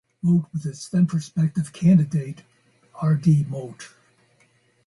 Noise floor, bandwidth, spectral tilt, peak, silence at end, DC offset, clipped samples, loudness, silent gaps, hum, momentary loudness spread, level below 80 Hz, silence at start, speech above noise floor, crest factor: -62 dBFS; 11.5 kHz; -8 dB/octave; -8 dBFS; 1 s; under 0.1%; under 0.1%; -22 LUFS; none; none; 19 LU; -62 dBFS; 0.25 s; 41 dB; 16 dB